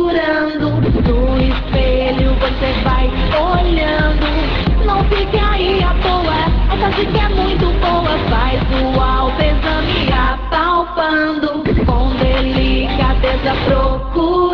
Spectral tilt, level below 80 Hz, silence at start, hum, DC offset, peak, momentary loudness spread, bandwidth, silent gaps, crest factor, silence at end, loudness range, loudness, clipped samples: -8 dB/octave; -18 dBFS; 0 s; none; under 0.1%; -2 dBFS; 2 LU; 5.4 kHz; none; 12 dB; 0 s; 0 LU; -15 LUFS; under 0.1%